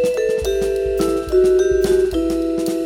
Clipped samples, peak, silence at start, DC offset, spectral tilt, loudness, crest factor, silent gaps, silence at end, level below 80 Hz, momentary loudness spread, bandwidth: under 0.1%; -6 dBFS; 0 s; under 0.1%; -5.5 dB/octave; -18 LUFS; 12 dB; none; 0 s; -34 dBFS; 5 LU; 16.5 kHz